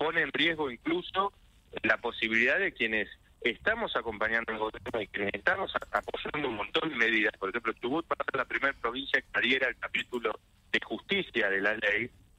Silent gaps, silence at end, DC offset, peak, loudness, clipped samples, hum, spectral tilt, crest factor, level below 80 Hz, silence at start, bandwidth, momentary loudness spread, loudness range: none; 0.3 s; under 0.1%; -12 dBFS; -30 LUFS; under 0.1%; none; -4.5 dB/octave; 20 dB; -60 dBFS; 0 s; 15 kHz; 8 LU; 2 LU